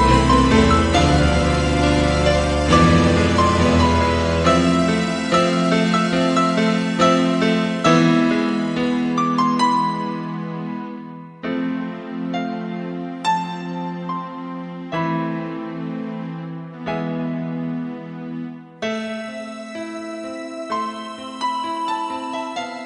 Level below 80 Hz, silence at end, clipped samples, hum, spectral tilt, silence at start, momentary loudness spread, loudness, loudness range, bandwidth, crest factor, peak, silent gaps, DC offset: -32 dBFS; 0 s; under 0.1%; none; -6 dB/octave; 0 s; 15 LU; -19 LUFS; 11 LU; 11 kHz; 18 dB; 0 dBFS; none; under 0.1%